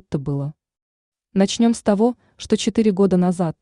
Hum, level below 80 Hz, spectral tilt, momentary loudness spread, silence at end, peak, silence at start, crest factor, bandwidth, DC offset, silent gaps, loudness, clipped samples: none; -52 dBFS; -6 dB/octave; 9 LU; 0.1 s; -4 dBFS; 0.1 s; 16 dB; 11 kHz; under 0.1%; 0.82-1.12 s; -19 LUFS; under 0.1%